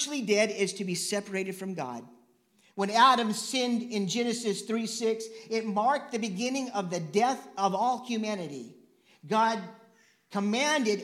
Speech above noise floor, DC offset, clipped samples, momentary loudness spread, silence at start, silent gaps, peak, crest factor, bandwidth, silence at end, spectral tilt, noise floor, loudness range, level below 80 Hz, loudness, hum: 37 dB; under 0.1%; under 0.1%; 11 LU; 0 s; none; -8 dBFS; 20 dB; 15.5 kHz; 0 s; -3.5 dB/octave; -66 dBFS; 3 LU; -88 dBFS; -29 LUFS; none